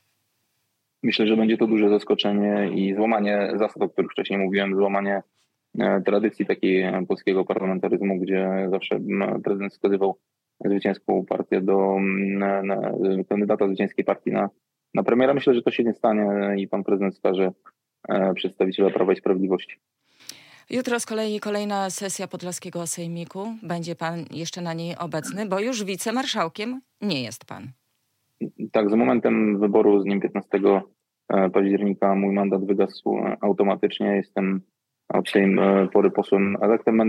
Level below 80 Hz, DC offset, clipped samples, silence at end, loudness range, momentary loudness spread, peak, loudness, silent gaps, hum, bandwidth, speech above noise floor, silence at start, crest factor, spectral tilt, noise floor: -74 dBFS; under 0.1%; under 0.1%; 0 s; 7 LU; 11 LU; -6 dBFS; -23 LUFS; none; none; 15.5 kHz; 52 dB; 1.05 s; 16 dB; -5.5 dB/octave; -74 dBFS